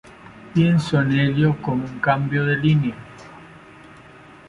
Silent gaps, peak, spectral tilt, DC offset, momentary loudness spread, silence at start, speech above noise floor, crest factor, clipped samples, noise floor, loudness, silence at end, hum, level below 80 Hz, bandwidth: none; -4 dBFS; -7.5 dB/octave; under 0.1%; 21 LU; 0.25 s; 26 dB; 18 dB; under 0.1%; -45 dBFS; -20 LUFS; 0.9 s; none; -50 dBFS; 10.5 kHz